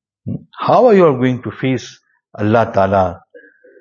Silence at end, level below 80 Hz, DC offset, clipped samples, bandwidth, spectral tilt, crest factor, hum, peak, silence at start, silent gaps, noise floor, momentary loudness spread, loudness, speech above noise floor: 0.65 s; -52 dBFS; under 0.1%; under 0.1%; 7.2 kHz; -7.5 dB/octave; 16 dB; none; 0 dBFS; 0.25 s; none; -44 dBFS; 18 LU; -14 LUFS; 31 dB